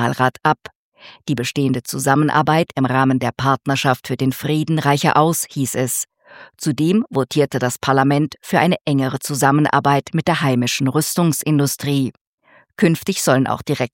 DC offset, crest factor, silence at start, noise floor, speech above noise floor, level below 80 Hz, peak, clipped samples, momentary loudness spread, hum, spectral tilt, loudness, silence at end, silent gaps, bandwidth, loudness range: under 0.1%; 18 dB; 0 s; -54 dBFS; 36 dB; -58 dBFS; 0 dBFS; under 0.1%; 6 LU; none; -5 dB/octave; -18 LUFS; 0.05 s; 0.75-0.92 s, 12.21-12.38 s; 17 kHz; 2 LU